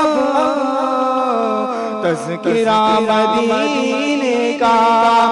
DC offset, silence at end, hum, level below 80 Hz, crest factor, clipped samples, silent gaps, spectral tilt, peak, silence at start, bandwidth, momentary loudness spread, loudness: under 0.1%; 0 s; none; -56 dBFS; 10 dB; under 0.1%; none; -4.5 dB/octave; -4 dBFS; 0 s; 11 kHz; 7 LU; -15 LUFS